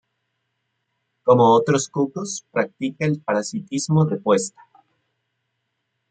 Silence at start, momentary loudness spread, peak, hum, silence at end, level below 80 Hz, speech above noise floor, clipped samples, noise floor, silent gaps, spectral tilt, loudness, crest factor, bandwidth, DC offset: 1.25 s; 11 LU; -4 dBFS; none; 1.65 s; -66 dBFS; 56 dB; under 0.1%; -76 dBFS; none; -5.5 dB/octave; -20 LUFS; 20 dB; 9.2 kHz; under 0.1%